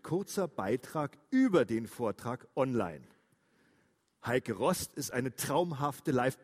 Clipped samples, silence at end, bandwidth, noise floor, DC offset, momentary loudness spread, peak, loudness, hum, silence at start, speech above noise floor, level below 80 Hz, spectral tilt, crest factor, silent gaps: under 0.1%; 0.1 s; 16 kHz; -72 dBFS; under 0.1%; 9 LU; -14 dBFS; -33 LUFS; none; 0.05 s; 40 dB; -68 dBFS; -5.5 dB/octave; 18 dB; none